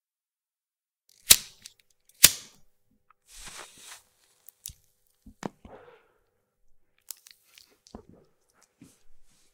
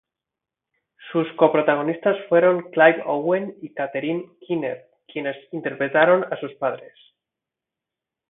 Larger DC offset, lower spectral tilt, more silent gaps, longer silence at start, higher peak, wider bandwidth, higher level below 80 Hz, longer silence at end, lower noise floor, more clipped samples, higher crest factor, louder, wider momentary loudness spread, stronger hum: neither; second, 1 dB/octave vs -10.5 dB/octave; neither; first, 1.3 s vs 1 s; about the same, 0 dBFS vs 0 dBFS; first, 17.5 kHz vs 4 kHz; first, -58 dBFS vs -74 dBFS; first, 7.15 s vs 1.5 s; about the same, under -90 dBFS vs -87 dBFS; neither; first, 32 dB vs 22 dB; about the same, -19 LUFS vs -21 LUFS; first, 27 LU vs 13 LU; neither